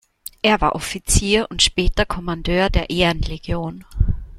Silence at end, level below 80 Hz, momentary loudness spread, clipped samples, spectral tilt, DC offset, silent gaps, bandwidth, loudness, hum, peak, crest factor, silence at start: 0 s; -26 dBFS; 10 LU; under 0.1%; -3.5 dB/octave; under 0.1%; none; 16.5 kHz; -19 LUFS; none; -2 dBFS; 18 dB; 0.45 s